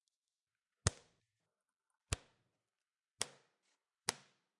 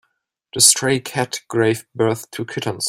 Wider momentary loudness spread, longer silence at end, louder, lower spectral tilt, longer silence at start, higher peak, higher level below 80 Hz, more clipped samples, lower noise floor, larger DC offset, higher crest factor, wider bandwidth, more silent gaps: second, 9 LU vs 14 LU; first, 0.45 s vs 0 s; second, -43 LUFS vs -17 LUFS; about the same, -2.5 dB/octave vs -2.5 dB/octave; first, 0.85 s vs 0.55 s; second, -10 dBFS vs 0 dBFS; about the same, -60 dBFS vs -58 dBFS; neither; first, under -90 dBFS vs -71 dBFS; neither; first, 38 dB vs 20 dB; second, 11.5 kHz vs 16.5 kHz; neither